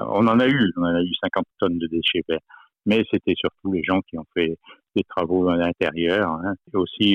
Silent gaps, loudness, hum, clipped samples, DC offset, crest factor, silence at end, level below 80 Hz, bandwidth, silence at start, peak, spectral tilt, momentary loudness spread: none; -22 LUFS; none; under 0.1%; under 0.1%; 14 dB; 0 s; -54 dBFS; 6.6 kHz; 0 s; -8 dBFS; -7.5 dB/octave; 9 LU